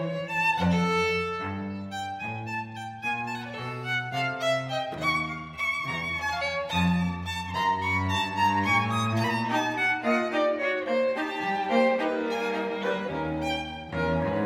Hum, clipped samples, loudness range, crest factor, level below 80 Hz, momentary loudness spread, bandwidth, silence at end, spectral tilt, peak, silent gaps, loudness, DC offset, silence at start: none; under 0.1%; 5 LU; 18 dB; -54 dBFS; 9 LU; 16 kHz; 0 s; -5.5 dB/octave; -10 dBFS; none; -27 LUFS; under 0.1%; 0 s